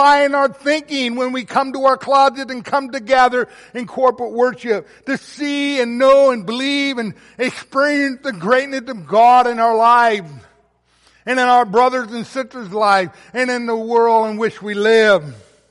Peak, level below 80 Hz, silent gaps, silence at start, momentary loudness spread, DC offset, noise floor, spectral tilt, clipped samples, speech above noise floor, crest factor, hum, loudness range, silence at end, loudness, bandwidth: -2 dBFS; -60 dBFS; none; 0 s; 13 LU; under 0.1%; -57 dBFS; -4 dB/octave; under 0.1%; 42 dB; 14 dB; none; 3 LU; 0.35 s; -16 LUFS; 11.5 kHz